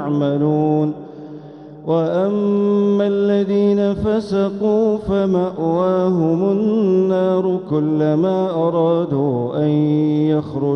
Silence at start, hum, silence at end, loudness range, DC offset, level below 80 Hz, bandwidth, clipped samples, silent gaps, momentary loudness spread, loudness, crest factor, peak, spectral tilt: 0 s; none; 0 s; 1 LU; under 0.1%; -48 dBFS; 6.4 kHz; under 0.1%; none; 4 LU; -17 LUFS; 12 dB; -6 dBFS; -9.5 dB/octave